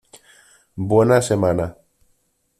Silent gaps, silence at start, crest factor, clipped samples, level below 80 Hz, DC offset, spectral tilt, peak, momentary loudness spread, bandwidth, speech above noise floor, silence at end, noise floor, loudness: none; 0.75 s; 18 dB; under 0.1%; -50 dBFS; under 0.1%; -6.5 dB/octave; -4 dBFS; 15 LU; 14 kHz; 48 dB; 0.9 s; -65 dBFS; -18 LUFS